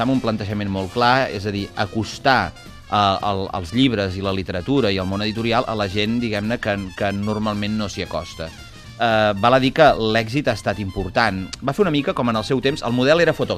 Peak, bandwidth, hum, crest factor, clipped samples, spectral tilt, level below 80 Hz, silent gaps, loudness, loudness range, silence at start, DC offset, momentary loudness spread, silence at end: 0 dBFS; 14.5 kHz; none; 20 dB; under 0.1%; -6 dB/octave; -42 dBFS; none; -20 LUFS; 4 LU; 0 s; under 0.1%; 9 LU; 0 s